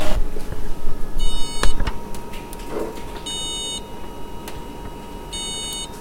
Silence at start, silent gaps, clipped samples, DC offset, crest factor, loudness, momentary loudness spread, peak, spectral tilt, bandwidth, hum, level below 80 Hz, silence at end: 0 s; none; under 0.1%; under 0.1%; 16 dB; -29 LUFS; 10 LU; 0 dBFS; -3 dB/octave; 15 kHz; none; -26 dBFS; 0 s